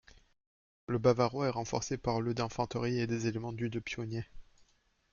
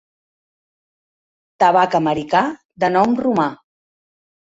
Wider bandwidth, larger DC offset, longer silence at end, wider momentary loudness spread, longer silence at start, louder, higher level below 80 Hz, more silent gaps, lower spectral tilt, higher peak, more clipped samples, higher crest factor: second, 7.2 kHz vs 8 kHz; neither; second, 0.7 s vs 0.95 s; first, 10 LU vs 7 LU; second, 0.9 s vs 1.6 s; second, -34 LUFS vs -17 LUFS; about the same, -58 dBFS vs -58 dBFS; second, none vs 2.65-2.69 s; about the same, -6 dB/octave vs -6 dB/octave; second, -14 dBFS vs -2 dBFS; neither; about the same, 22 dB vs 18 dB